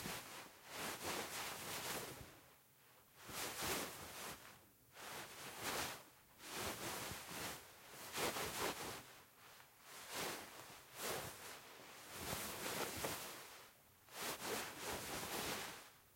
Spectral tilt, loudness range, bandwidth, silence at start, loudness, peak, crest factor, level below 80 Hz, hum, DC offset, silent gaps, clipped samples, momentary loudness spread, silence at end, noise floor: -2 dB/octave; 3 LU; 16.5 kHz; 0 s; -47 LUFS; -28 dBFS; 20 dB; -72 dBFS; none; under 0.1%; none; under 0.1%; 18 LU; 0 s; -69 dBFS